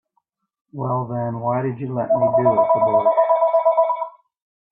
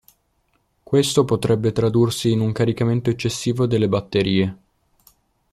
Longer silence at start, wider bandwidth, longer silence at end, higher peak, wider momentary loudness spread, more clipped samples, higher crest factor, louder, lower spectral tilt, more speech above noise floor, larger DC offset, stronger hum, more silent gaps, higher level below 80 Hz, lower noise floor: second, 0.75 s vs 0.9 s; second, 3.8 kHz vs 14.5 kHz; second, 0.6 s vs 0.95 s; about the same, -4 dBFS vs -4 dBFS; first, 10 LU vs 4 LU; neither; about the same, 14 dB vs 18 dB; about the same, -19 LUFS vs -20 LUFS; first, -13 dB/octave vs -6 dB/octave; first, 53 dB vs 47 dB; neither; neither; neither; second, -62 dBFS vs -50 dBFS; first, -71 dBFS vs -66 dBFS